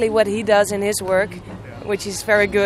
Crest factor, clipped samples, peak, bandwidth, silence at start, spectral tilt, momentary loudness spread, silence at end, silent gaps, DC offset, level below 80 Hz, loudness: 16 dB; under 0.1%; -4 dBFS; 14.5 kHz; 0 s; -4 dB/octave; 15 LU; 0 s; none; under 0.1%; -46 dBFS; -19 LUFS